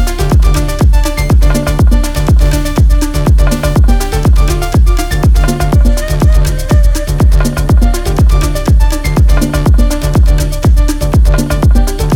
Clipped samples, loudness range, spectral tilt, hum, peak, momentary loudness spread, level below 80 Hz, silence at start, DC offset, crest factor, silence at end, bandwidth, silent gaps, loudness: under 0.1%; 0 LU; -6 dB/octave; none; 0 dBFS; 2 LU; -8 dBFS; 0 s; under 0.1%; 8 dB; 0 s; 16.5 kHz; none; -11 LUFS